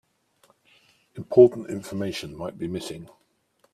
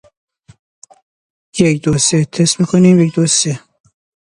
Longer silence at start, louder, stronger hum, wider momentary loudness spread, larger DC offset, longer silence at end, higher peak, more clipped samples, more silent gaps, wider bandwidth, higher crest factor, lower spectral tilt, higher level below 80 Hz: second, 1.15 s vs 1.55 s; second, -23 LUFS vs -12 LUFS; neither; first, 24 LU vs 8 LU; neither; about the same, 0.7 s vs 0.75 s; about the same, -2 dBFS vs 0 dBFS; neither; neither; first, 13 kHz vs 11 kHz; first, 24 dB vs 16 dB; first, -6.5 dB/octave vs -4.5 dB/octave; second, -62 dBFS vs -48 dBFS